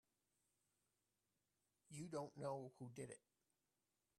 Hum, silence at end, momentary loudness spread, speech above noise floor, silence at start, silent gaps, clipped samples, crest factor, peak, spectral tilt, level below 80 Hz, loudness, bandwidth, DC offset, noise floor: none; 1 s; 9 LU; over 38 dB; 1.9 s; none; under 0.1%; 22 dB; -36 dBFS; -6 dB/octave; -90 dBFS; -53 LUFS; 12 kHz; under 0.1%; under -90 dBFS